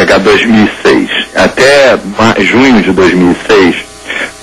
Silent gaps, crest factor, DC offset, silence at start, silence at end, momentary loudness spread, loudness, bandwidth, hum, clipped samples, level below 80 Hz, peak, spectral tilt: none; 6 dB; under 0.1%; 0 s; 0 s; 6 LU; -6 LUFS; 16 kHz; none; 2%; -34 dBFS; 0 dBFS; -4.5 dB/octave